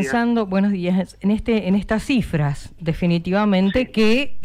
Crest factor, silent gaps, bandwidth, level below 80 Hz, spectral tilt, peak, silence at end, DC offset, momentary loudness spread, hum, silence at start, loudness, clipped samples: 10 dB; none; 12 kHz; -38 dBFS; -7 dB/octave; -8 dBFS; 0 s; under 0.1%; 5 LU; none; 0 s; -20 LUFS; under 0.1%